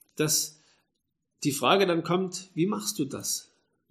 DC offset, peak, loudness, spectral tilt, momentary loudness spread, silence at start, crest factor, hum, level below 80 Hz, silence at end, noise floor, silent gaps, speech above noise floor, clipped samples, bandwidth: under 0.1%; -6 dBFS; -27 LUFS; -3.5 dB/octave; 10 LU; 0.15 s; 24 dB; none; -72 dBFS; 0.5 s; -81 dBFS; none; 54 dB; under 0.1%; 15.5 kHz